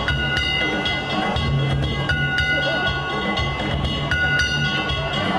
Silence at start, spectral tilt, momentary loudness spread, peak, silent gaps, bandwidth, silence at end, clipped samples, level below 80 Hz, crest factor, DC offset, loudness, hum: 0 s; -5 dB/octave; 4 LU; -8 dBFS; none; 11.5 kHz; 0 s; under 0.1%; -32 dBFS; 14 dB; under 0.1%; -20 LUFS; none